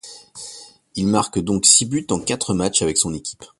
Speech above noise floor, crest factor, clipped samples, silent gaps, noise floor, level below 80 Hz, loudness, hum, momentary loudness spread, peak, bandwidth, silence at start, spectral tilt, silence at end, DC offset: 22 dB; 20 dB; under 0.1%; none; -41 dBFS; -46 dBFS; -17 LUFS; none; 22 LU; 0 dBFS; 11.5 kHz; 0.05 s; -3 dB/octave; 0.15 s; under 0.1%